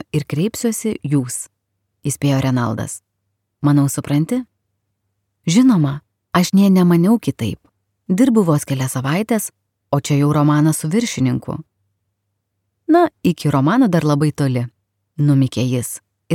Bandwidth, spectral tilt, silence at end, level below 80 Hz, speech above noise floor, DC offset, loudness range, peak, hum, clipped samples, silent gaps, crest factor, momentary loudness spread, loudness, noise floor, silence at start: 16.5 kHz; -6.5 dB/octave; 0 s; -54 dBFS; 57 dB; under 0.1%; 4 LU; 0 dBFS; none; under 0.1%; none; 16 dB; 14 LU; -17 LUFS; -73 dBFS; 0.15 s